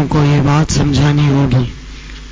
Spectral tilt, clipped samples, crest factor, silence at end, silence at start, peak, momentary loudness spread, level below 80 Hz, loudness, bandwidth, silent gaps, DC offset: -6.5 dB/octave; under 0.1%; 10 dB; 0 s; 0 s; -4 dBFS; 20 LU; -28 dBFS; -13 LUFS; 8 kHz; none; under 0.1%